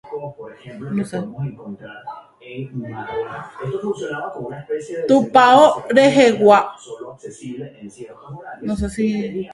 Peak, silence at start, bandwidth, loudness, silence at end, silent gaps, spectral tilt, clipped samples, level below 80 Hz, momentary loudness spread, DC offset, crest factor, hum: 0 dBFS; 0.05 s; 11.5 kHz; -17 LUFS; 0 s; none; -5.5 dB/octave; under 0.1%; -46 dBFS; 24 LU; under 0.1%; 18 dB; none